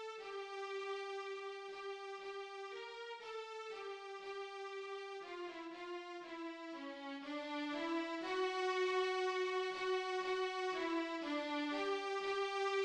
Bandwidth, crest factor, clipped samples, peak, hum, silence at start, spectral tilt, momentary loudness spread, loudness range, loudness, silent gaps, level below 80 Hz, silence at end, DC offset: 10 kHz; 16 dB; under 0.1%; -28 dBFS; none; 0 s; -2 dB/octave; 10 LU; 9 LU; -42 LUFS; none; -84 dBFS; 0 s; under 0.1%